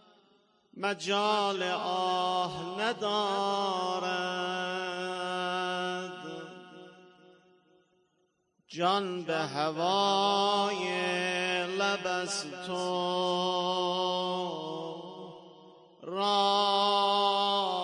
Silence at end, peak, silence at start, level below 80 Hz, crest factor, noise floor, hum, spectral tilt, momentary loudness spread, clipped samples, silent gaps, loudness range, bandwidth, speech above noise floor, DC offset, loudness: 0 s; -14 dBFS; 0.75 s; -80 dBFS; 18 dB; -75 dBFS; none; -3.5 dB/octave; 13 LU; under 0.1%; none; 8 LU; 11 kHz; 45 dB; under 0.1%; -30 LUFS